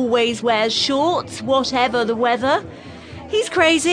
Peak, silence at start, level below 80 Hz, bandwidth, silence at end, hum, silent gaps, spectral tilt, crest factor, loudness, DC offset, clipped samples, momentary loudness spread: -2 dBFS; 0 s; -52 dBFS; 10.5 kHz; 0 s; none; none; -3 dB/octave; 18 dB; -18 LUFS; under 0.1%; under 0.1%; 14 LU